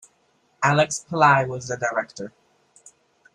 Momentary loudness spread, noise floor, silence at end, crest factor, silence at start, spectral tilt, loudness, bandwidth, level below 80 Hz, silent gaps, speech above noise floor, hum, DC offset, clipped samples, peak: 18 LU; -64 dBFS; 1.05 s; 22 dB; 0.6 s; -4.5 dB/octave; -21 LUFS; 11.5 kHz; -62 dBFS; none; 43 dB; none; under 0.1%; under 0.1%; -2 dBFS